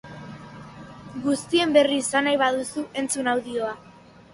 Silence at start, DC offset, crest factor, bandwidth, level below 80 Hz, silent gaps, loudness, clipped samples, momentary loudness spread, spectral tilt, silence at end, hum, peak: 0.05 s; under 0.1%; 20 dB; 11.5 kHz; -60 dBFS; none; -23 LUFS; under 0.1%; 22 LU; -3 dB/octave; 0.55 s; none; -4 dBFS